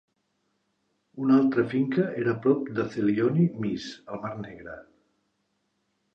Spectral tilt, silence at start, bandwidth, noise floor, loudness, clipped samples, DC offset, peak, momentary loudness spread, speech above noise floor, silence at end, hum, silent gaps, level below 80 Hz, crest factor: -8.5 dB/octave; 1.15 s; 7.6 kHz; -75 dBFS; -26 LUFS; under 0.1%; under 0.1%; -8 dBFS; 17 LU; 50 dB; 1.35 s; none; none; -66 dBFS; 18 dB